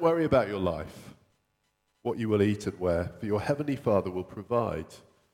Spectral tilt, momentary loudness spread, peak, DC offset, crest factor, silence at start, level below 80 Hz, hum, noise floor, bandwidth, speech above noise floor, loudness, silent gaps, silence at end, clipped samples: -7.5 dB/octave; 12 LU; -10 dBFS; under 0.1%; 20 dB; 0 s; -54 dBFS; none; -76 dBFS; 16.5 kHz; 47 dB; -29 LUFS; none; 0.35 s; under 0.1%